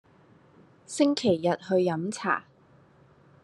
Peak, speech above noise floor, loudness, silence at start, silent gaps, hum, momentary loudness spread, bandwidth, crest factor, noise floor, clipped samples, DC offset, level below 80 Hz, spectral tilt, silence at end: -10 dBFS; 33 dB; -27 LUFS; 0.9 s; none; none; 7 LU; 11.5 kHz; 18 dB; -58 dBFS; under 0.1%; under 0.1%; -70 dBFS; -5 dB/octave; 1 s